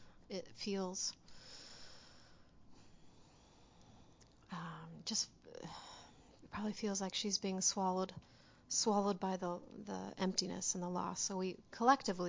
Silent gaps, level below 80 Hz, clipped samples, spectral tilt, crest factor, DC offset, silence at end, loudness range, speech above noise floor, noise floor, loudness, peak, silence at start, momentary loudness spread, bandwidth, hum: none; -72 dBFS; under 0.1%; -3 dB/octave; 26 dB; under 0.1%; 0 s; 17 LU; 26 dB; -65 dBFS; -39 LUFS; -16 dBFS; 0 s; 19 LU; 7.8 kHz; none